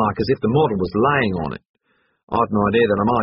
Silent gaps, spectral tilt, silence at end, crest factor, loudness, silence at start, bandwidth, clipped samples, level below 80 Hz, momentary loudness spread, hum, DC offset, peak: 1.69-1.74 s, 2.23-2.27 s; -5.5 dB/octave; 0 s; 16 dB; -19 LUFS; 0 s; 5.8 kHz; under 0.1%; -46 dBFS; 9 LU; none; under 0.1%; -4 dBFS